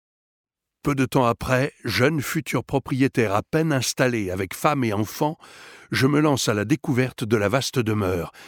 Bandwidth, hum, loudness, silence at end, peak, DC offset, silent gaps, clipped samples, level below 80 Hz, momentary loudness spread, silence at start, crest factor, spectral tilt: 19 kHz; none; -23 LUFS; 0 s; -4 dBFS; under 0.1%; none; under 0.1%; -50 dBFS; 6 LU; 0.85 s; 18 dB; -5.5 dB/octave